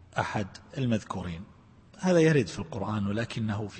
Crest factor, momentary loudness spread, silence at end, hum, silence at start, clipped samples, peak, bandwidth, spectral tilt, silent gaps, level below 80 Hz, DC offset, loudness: 18 dB; 14 LU; 0 s; none; 0.15 s; under 0.1%; -10 dBFS; 8.8 kHz; -6.5 dB/octave; none; -56 dBFS; under 0.1%; -29 LUFS